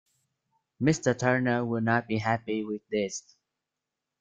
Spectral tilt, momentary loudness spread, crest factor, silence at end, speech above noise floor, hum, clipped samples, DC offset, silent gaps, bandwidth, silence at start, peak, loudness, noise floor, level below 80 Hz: -5.5 dB/octave; 7 LU; 20 dB; 1 s; 60 dB; none; under 0.1%; under 0.1%; none; 9.4 kHz; 0.8 s; -10 dBFS; -28 LUFS; -87 dBFS; -66 dBFS